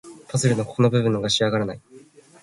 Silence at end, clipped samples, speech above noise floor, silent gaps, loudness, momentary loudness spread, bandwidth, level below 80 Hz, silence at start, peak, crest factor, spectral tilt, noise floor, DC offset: 0.45 s; under 0.1%; 28 dB; none; -22 LUFS; 10 LU; 11.5 kHz; -56 dBFS; 0.05 s; -6 dBFS; 16 dB; -5 dB/octave; -49 dBFS; under 0.1%